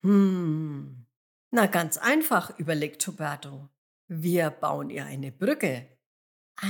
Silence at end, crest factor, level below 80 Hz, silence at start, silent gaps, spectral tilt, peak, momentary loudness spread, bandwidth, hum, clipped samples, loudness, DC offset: 0 s; 20 dB; -86 dBFS; 0.05 s; 1.16-1.51 s, 3.78-4.08 s, 6.06-6.55 s; -5 dB/octave; -8 dBFS; 15 LU; 19.5 kHz; none; under 0.1%; -27 LUFS; under 0.1%